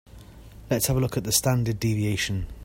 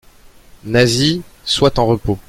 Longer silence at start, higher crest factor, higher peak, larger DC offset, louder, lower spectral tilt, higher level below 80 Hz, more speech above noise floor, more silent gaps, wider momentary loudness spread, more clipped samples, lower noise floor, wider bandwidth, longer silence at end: second, 0.15 s vs 0.65 s; about the same, 20 dB vs 16 dB; second, -6 dBFS vs 0 dBFS; neither; second, -25 LUFS vs -15 LUFS; about the same, -4.5 dB/octave vs -5 dB/octave; second, -42 dBFS vs -36 dBFS; second, 21 dB vs 29 dB; neither; about the same, 6 LU vs 8 LU; neither; about the same, -45 dBFS vs -44 dBFS; about the same, 16.5 kHz vs 16 kHz; about the same, 0 s vs 0.1 s